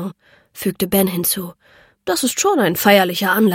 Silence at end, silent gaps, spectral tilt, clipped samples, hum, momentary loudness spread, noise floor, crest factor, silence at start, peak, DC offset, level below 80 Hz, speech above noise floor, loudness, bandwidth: 0 s; none; -4 dB/octave; under 0.1%; none; 14 LU; -37 dBFS; 18 dB; 0 s; 0 dBFS; under 0.1%; -54 dBFS; 21 dB; -17 LUFS; 17 kHz